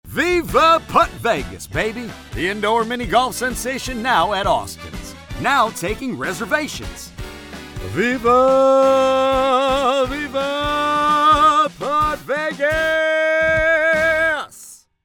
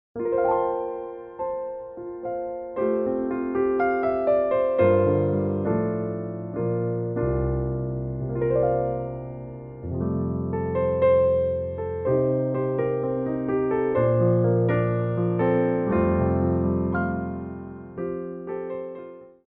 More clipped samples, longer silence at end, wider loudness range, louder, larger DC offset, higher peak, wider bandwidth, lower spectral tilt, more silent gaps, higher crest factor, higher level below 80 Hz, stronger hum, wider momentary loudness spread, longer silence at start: neither; first, 0.3 s vs 0.15 s; about the same, 5 LU vs 5 LU; first, -17 LUFS vs -25 LUFS; neither; first, -2 dBFS vs -8 dBFS; first, 19 kHz vs 4 kHz; second, -4 dB/octave vs -9.5 dB/octave; neither; about the same, 16 dB vs 16 dB; first, -38 dBFS vs -44 dBFS; neither; first, 17 LU vs 13 LU; about the same, 0.05 s vs 0.15 s